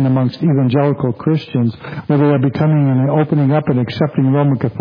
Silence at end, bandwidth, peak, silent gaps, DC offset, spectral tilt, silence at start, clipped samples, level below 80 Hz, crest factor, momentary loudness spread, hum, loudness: 0 s; 5.2 kHz; 0 dBFS; none; under 0.1%; -10.5 dB/octave; 0 s; under 0.1%; -54 dBFS; 14 dB; 5 LU; none; -15 LUFS